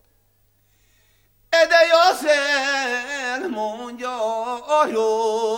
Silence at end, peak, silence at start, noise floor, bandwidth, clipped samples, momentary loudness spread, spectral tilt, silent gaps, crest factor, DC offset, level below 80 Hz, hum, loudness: 0 s; -2 dBFS; 1.5 s; -63 dBFS; 17 kHz; under 0.1%; 12 LU; -1 dB/octave; none; 18 dB; under 0.1%; -64 dBFS; 50 Hz at -70 dBFS; -19 LUFS